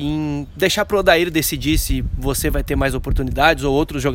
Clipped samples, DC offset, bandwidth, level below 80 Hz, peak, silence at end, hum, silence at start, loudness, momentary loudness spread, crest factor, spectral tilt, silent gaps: under 0.1%; under 0.1%; 17 kHz; -26 dBFS; 0 dBFS; 0 s; none; 0 s; -18 LUFS; 8 LU; 18 dB; -4.5 dB/octave; none